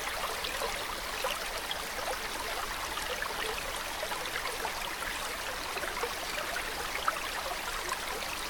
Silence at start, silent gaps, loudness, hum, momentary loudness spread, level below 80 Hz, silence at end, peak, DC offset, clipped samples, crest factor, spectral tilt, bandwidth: 0 s; none; -34 LUFS; none; 2 LU; -50 dBFS; 0 s; -14 dBFS; under 0.1%; under 0.1%; 22 dB; -1 dB/octave; 19 kHz